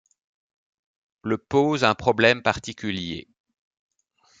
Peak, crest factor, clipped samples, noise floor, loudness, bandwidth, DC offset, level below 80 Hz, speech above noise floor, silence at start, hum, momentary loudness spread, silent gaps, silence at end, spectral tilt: -2 dBFS; 22 dB; under 0.1%; -63 dBFS; -22 LUFS; 9.2 kHz; under 0.1%; -58 dBFS; 40 dB; 1.25 s; none; 14 LU; none; 1.2 s; -5 dB/octave